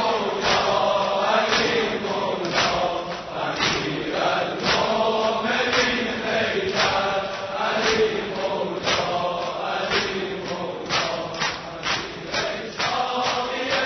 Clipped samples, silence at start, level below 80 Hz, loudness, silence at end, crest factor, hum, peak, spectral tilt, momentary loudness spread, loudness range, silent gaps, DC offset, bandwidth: under 0.1%; 0 s; -52 dBFS; -23 LUFS; 0 s; 18 dB; none; -6 dBFS; -3 dB/octave; 7 LU; 4 LU; none; under 0.1%; 6.4 kHz